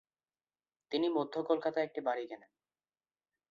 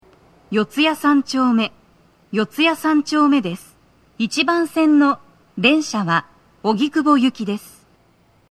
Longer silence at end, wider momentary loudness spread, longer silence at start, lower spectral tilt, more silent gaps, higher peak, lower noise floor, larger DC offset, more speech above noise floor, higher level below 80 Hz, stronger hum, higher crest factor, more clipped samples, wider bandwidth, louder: first, 1.15 s vs 0.85 s; about the same, 9 LU vs 11 LU; first, 0.9 s vs 0.5 s; second, -3 dB/octave vs -4.5 dB/octave; neither; second, -18 dBFS vs 0 dBFS; first, under -90 dBFS vs -56 dBFS; neither; first, over 55 dB vs 39 dB; second, -84 dBFS vs -64 dBFS; neither; about the same, 20 dB vs 18 dB; neither; second, 7.2 kHz vs 14 kHz; second, -35 LUFS vs -18 LUFS